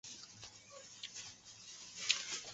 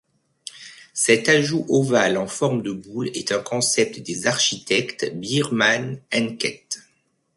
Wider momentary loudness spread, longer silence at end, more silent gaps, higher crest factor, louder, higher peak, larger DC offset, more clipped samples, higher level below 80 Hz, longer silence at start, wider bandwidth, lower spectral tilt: first, 18 LU vs 15 LU; second, 0 s vs 0.55 s; neither; first, 36 dB vs 18 dB; second, -42 LUFS vs -21 LUFS; second, -10 dBFS vs -4 dBFS; neither; neither; second, -80 dBFS vs -64 dBFS; second, 0.05 s vs 0.55 s; second, 8 kHz vs 12 kHz; second, 2 dB/octave vs -3.5 dB/octave